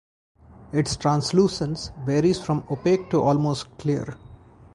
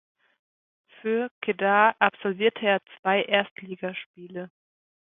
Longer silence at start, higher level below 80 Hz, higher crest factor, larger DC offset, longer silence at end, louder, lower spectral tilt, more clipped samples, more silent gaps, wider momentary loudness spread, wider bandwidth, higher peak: second, 0.6 s vs 1.05 s; first, -50 dBFS vs -76 dBFS; about the same, 18 dB vs 22 dB; neither; second, 0.4 s vs 0.6 s; about the same, -23 LUFS vs -25 LUFS; second, -6.5 dB/octave vs -8.5 dB/octave; neither; second, none vs 1.31-1.41 s, 2.99-3.03 s, 3.51-3.56 s, 4.06-4.14 s; second, 8 LU vs 19 LU; first, 11.5 kHz vs 4 kHz; about the same, -6 dBFS vs -4 dBFS